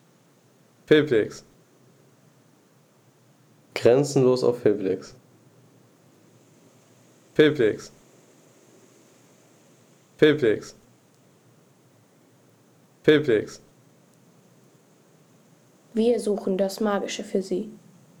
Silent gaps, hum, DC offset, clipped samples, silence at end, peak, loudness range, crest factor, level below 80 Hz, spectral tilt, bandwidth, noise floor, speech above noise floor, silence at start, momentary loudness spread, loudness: none; none; under 0.1%; under 0.1%; 0.45 s; -6 dBFS; 3 LU; 20 dB; -66 dBFS; -5.5 dB/octave; 14.5 kHz; -59 dBFS; 37 dB; 0.9 s; 17 LU; -23 LUFS